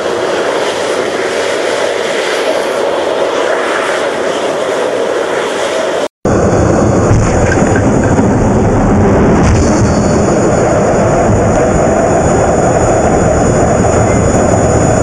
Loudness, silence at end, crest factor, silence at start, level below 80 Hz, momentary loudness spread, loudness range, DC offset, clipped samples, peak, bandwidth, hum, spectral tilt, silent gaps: -11 LUFS; 0 s; 10 dB; 0 s; -22 dBFS; 4 LU; 4 LU; under 0.1%; under 0.1%; 0 dBFS; 12.5 kHz; none; -5.5 dB/octave; 6.10-6.22 s